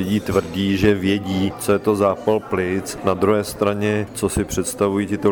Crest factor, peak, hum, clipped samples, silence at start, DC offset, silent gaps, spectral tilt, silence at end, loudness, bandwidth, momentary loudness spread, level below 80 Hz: 14 dB; -4 dBFS; none; under 0.1%; 0 s; under 0.1%; none; -5.5 dB/octave; 0 s; -20 LUFS; 20 kHz; 5 LU; -42 dBFS